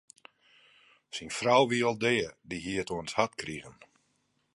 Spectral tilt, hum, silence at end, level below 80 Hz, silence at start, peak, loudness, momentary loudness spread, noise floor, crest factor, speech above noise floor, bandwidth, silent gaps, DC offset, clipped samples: -4 dB/octave; none; 0.85 s; -64 dBFS; 1.15 s; -10 dBFS; -30 LUFS; 16 LU; -74 dBFS; 22 dB; 45 dB; 11.5 kHz; none; under 0.1%; under 0.1%